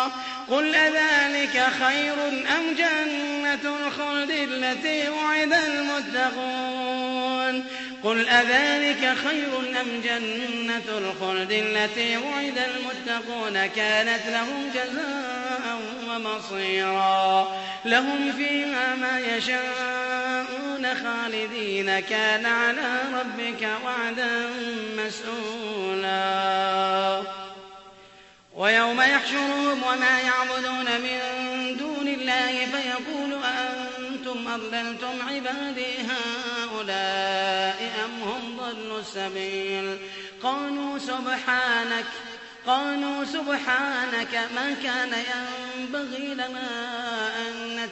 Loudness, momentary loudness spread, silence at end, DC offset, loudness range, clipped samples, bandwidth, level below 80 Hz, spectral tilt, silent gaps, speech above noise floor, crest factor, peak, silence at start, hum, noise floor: -25 LUFS; 10 LU; 0 s; under 0.1%; 5 LU; under 0.1%; 8.4 kHz; -68 dBFS; -2.5 dB/octave; none; 26 dB; 20 dB; -6 dBFS; 0 s; none; -52 dBFS